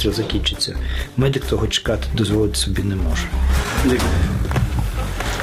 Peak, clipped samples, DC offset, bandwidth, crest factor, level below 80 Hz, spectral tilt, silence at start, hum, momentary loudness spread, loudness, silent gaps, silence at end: -4 dBFS; under 0.1%; under 0.1%; 15.5 kHz; 16 dB; -24 dBFS; -5 dB/octave; 0 s; none; 5 LU; -20 LUFS; none; 0 s